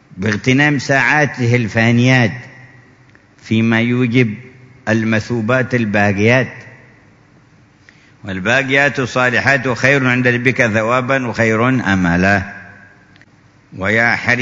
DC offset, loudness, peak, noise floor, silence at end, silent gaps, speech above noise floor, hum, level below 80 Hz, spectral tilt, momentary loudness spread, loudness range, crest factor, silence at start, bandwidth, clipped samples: under 0.1%; -14 LUFS; 0 dBFS; -48 dBFS; 0 s; none; 34 dB; none; -48 dBFS; -6 dB/octave; 8 LU; 4 LU; 16 dB; 0.1 s; 7.8 kHz; under 0.1%